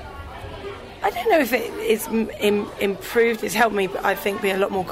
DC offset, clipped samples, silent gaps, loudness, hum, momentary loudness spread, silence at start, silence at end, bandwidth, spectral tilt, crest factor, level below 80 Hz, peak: under 0.1%; under 0.1%; none; -22 LUFS; none; 15 LU; 0 s; 0 s; 16 kHz; -4 dB/octave; 18 dB; -46 dBFS; -6 dBFS